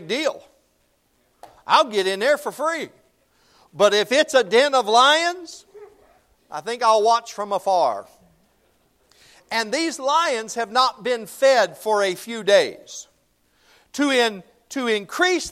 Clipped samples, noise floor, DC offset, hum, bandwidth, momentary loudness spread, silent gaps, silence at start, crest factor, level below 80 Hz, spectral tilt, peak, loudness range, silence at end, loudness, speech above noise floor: under 0.1%; -65 dBFS; under 0.1%; none; 16 kHz; 18 LU; none; 0 s; 20 dB; -66 dBFS; -2 dB/octave; -2 dBFS; 5 LU; 0 s; -20 LUFS; 45 dB